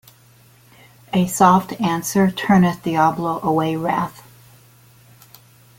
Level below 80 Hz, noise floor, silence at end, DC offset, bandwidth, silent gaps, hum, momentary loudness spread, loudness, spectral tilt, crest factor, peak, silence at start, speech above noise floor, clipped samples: -56 dBFS; -51 dBFS; 1.6 s; under 0.1%; 17 kHz; none; none; 8 LU; -18 LUFS; -6 dB/octave; 18 dB; -2 dBFS; 1.15 s; 33 dB; under 0.1%